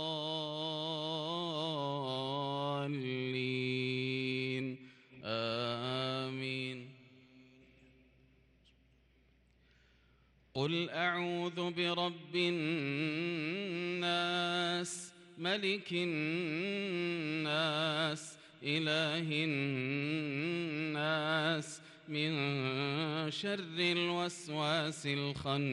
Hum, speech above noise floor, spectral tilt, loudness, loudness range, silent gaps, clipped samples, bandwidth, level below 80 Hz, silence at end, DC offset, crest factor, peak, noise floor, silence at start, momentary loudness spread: none; 33 dB; -5 dB/octave; -36 LUFS; 5 LU; none; under 0.1%; 12 kHz; -74 dBFS; 0 s; under 0.1%; 16 dB; -20 dBFS; -69 dBFS; 0 s; 6 LU